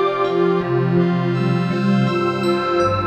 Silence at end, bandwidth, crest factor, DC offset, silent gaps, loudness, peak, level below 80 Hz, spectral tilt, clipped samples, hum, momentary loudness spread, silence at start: 0 s; 8.6 kHz; 12 dB; under 0.1%; none; -18 LUFS; -6 dBFS; -52 dBFS; -8 dB/octave; under 0.1%; none; 2 LU; 0 s